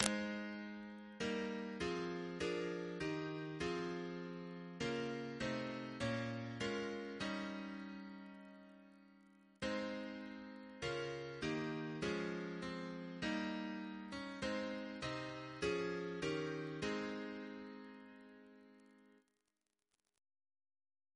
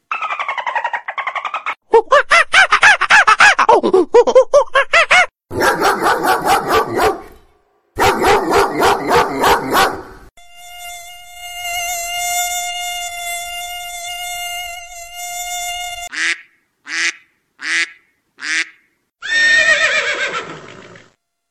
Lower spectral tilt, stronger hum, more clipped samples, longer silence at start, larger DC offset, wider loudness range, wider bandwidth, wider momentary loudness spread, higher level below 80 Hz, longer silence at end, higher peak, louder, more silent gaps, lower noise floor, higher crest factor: first, -4.5 dB/octave vs -2 dB/octave; neither; neither; about the same, 0 s vs 0.1 s; neither; second, 6 LU vs 12 LU; second, 11 kHz vs 16 kHz; second, 12 LU vs 18 LU; second, -70 dBFS vs -44 dBFS; first, 2.05 s vs 0.55 s; second, -10 dBFS vs 0 dBFS; second, -44 LUFS vs -14 LUFS; neither; first, -90 dBFS vs -57 dBFS; first, 34 dB vs 16 dB